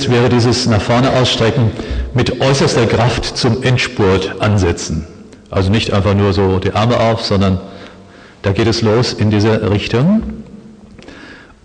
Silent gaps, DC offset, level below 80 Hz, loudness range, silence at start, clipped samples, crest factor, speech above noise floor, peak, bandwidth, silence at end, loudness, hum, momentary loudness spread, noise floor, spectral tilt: none; under 0.1%; -32 dBFS; 2 LU; 0 s; under 0.1%; 12 dB; 26 dB; -2 dBFS; 9.8 kHz; 0.25 s; -14 LUFS; none; 10 LU; -39 dBFS; -6 dB/octave